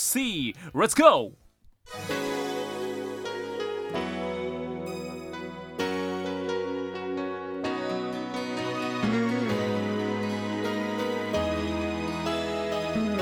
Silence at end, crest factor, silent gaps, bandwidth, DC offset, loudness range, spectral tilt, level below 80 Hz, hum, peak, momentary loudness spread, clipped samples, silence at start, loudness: 0 s; 26 dB; none; 19 kHz; under 0.1%; 6 LU; -4 dB/octave; -54 dBFS; none; -2 dBFS; 8 LU; under 0.1%; 0 s; -29 LUFS